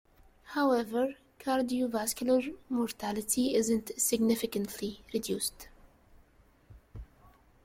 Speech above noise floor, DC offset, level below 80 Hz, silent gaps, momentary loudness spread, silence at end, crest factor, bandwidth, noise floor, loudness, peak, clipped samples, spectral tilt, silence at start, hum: 32 dB; under 0.1%; -60 dBFS; none; 12 LU; 0.6 s; 16 dB; 16.5 kHz; -63 dBFS; -31 LUFS; -16 dBFS; under 0.1%; -3.5 dB/octave; 0.45 s; none